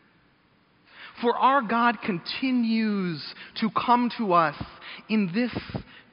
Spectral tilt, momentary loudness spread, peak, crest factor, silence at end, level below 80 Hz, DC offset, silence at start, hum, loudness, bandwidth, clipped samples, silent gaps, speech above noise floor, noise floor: -4 dB/octave; 17 LU; -6 dBFS; 20 dB; 0.1 s; -58 dBFS; under 0.1%; 0.95 s; none; -25 LUFS; 5.4 kHz; under 0.1%; none; 37 dB; -62 dBFS